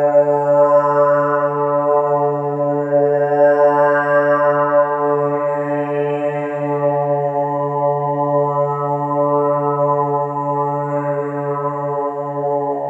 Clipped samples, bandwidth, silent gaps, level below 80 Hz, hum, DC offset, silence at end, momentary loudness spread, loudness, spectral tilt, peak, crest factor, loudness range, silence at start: under 0.1%; 3.2 kHz; none; -86 dBFS; none; under 0.1%; 0 s; 8 LU; -17 LUFS; -9.5 dB/octave; -2 dBFS; 14 dB; 4 LU; 0 s